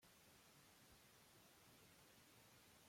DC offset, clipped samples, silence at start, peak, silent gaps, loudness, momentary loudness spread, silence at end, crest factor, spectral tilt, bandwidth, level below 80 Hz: under 0.1%; under 0.1%; 0 s; -56 dBFS; none; -68 LUFS; 1 LU; 0 s; 14 dB; -2.5 dB/octave; 16.5 kHz; -86 dBFS